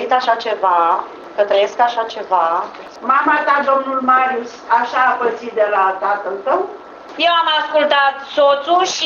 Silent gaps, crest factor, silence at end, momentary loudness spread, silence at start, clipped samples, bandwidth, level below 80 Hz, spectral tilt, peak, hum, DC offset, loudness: none; 16 dB; 0 s; 8 LU; 0 s; under 0.1%; 7.4 kHz; -66 dBFS; -1.5 dB/octave; 0 dBFS; none; under 0.1%; -15 LUFS